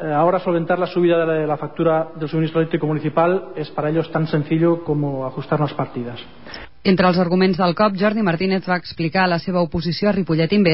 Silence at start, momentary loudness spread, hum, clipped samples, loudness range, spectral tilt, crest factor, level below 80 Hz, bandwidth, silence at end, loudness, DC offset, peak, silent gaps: 0 s; 8 LU; none; under 0.1%; 3 LU; -11.5 dB/octave; 14 dB; -50 dBFS; 5.8 kHz; 0 s; -19 LUFS; 0.8%; -4 dBFS; none